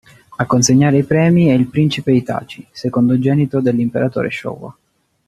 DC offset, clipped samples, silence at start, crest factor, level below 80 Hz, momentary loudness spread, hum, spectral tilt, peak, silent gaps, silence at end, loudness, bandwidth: under 0.1%; under 0.1%; 0.3 s; 14 dB; -50 dBFS; 13 LU; none; -6 dB/octave; 0 dBFS; none; 0.55 s; -15 LUFS; 13 kHz